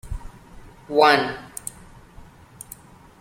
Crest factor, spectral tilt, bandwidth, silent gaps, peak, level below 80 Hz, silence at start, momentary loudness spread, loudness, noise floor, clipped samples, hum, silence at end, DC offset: 22 dB; -3.5 dB/octave; 16.5 kHz; none; -4 dBFS; -42 dBFS; 0.05 s; 25 LU; -19 LUFS; -46 dBFS; under 0.1%; none; 1.75 s; under 0.1%